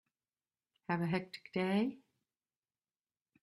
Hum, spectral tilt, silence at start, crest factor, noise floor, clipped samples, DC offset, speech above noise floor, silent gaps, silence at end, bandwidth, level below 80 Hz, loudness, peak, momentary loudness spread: none; -7.5 dB/octave; 0.9 s; 22 dB; under -90 dBFS; under 0.1%; under 0.1%; over 54 dB; none; 1.45 s; 12 kHz; -78 dBFS; -37 LUFS; -20 dBFS; 7 LU